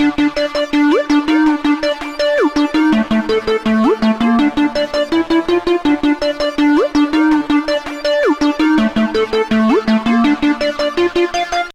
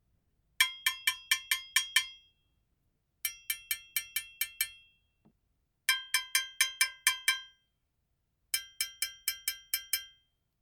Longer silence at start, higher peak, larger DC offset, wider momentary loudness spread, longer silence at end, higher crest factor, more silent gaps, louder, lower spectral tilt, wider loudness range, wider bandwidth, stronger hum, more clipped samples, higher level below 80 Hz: second, 0 s vs 0.6 s; first, -2 dBFS vs -8 dBFS; neither; second, 4 LU vs 9 LU; second, 0.05 s vs 0.55 s; second, 10 dB vs 28 dB; neither; first, -14 LUFS vs -31 LUFS; first, -5 dB/octave vs 5 dB/octave; second, 0 LU vs 6 LU; second, 10.5 kHz vs 19.5 kHz; neither; neither; first, -40 dBFS vs -74 dBFS